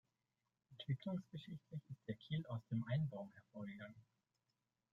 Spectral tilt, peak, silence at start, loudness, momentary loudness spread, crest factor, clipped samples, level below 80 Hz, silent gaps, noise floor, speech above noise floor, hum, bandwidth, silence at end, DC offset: -8.5 dB/octave; -30 dBFS; 0.7 s; -47 LUFS; 13 LU; 18 dB; under 0.1%; -80 dBFS; none; under -90 dBFS; over 44 dB; none; 6.8 kHz; 0.9 s; under 0.1%